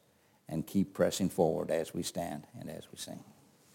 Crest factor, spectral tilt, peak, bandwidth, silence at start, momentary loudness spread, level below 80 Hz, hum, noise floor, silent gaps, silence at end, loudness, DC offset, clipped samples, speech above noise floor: 20 dB; -5.5 dB/octave; -14 dBFS; 17 kHz; 0.5 s; 15 LU; -66 dBFS; none; -58 dBFS; none; 0.45 s; -34 LUFS; under 0.1%; under 0.1%; 24 dB